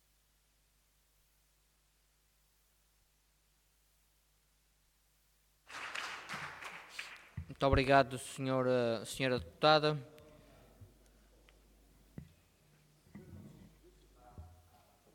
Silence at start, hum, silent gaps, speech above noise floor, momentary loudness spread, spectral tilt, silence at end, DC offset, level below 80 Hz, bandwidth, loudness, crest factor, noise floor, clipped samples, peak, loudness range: 5.7 s; none; none; 42 dB; 27 LU; -5 dB/octave; 0.65 s; under 0.1%; -56 dBFS; 18.5 kHz; -34 LUFS; 26 dB; -74 dBFS; under 0.1%; -14 dBFS; 16 LU